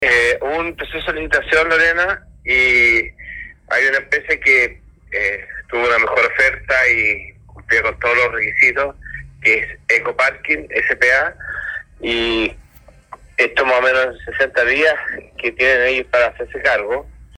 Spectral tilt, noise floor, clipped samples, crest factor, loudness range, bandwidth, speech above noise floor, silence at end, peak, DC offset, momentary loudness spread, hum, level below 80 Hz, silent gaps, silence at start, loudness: -3.5 dB/octave; -46 dBFS; under 0.1%; 18 dB; 3 LU; 12.5 kHz; 30 dB; 0.15 s; 0 dBFS; under 0.1%; 12 LU; none; -42 dBFS; none; 0 s; -15 LUFS